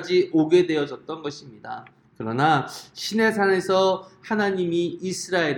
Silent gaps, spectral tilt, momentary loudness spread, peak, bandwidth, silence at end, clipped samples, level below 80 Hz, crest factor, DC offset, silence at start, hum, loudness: none; -5 dB/octave; 16 LU; -4 dBFS; 17 kHz; 0 s; under 0.1%; -66 dBFS; 18 dB; under 0.1%; 0 s; none; -23 LUFS